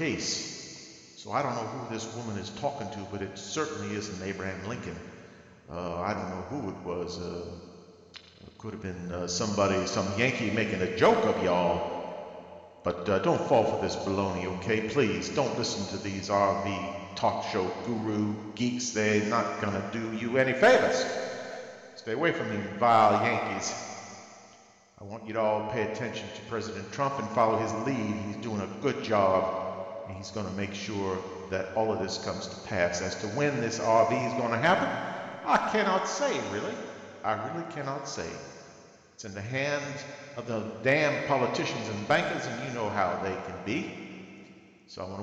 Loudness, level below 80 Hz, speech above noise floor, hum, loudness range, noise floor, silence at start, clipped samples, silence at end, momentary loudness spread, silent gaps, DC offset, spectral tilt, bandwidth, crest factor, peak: -29 LUFS; -62 dBFS; 28 dB; none; 9 LU; -57 dBFS; 0 s; under 0.1%; 0 s; 16 LU; none; under 0.1%; -4.5 dB/octave; 9 kHz; 20 dB; -10 dBFS